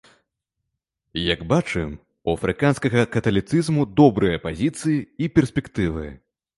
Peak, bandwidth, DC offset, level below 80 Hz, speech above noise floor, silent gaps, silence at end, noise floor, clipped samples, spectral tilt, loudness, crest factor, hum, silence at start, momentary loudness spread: -2 dBFS; 11.5 kHz; under 0.1%; -42 dBFS; 60 dB; none; 0.4 s; -80 dBFS; under 0.1%; -6.5 dB/octave; -21 LUFS; 20 dB; none; 1.15 s; 11 LU